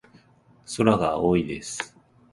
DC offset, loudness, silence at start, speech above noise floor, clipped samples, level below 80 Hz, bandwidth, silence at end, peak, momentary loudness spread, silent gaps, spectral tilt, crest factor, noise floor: under 0.1%; -24 LUFS; 0.7 s; 34 dB; under 0.1%; -50 dBFS; 11.5 kHz; 0.45 s; -4 dBFS; 14 LU; none; -5.5 dB/octave; 22 dB; -57 dBFS